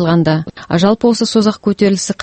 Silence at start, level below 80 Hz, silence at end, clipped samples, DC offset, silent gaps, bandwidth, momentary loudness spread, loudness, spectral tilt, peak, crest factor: 0 s; -46 dBFS; 0 s; under 0.1%; under 0.1%; none; 8.8 kHz; 5 LU; -13 LUFS; -5.5 dB/octave; 0 dBFS; 12 dB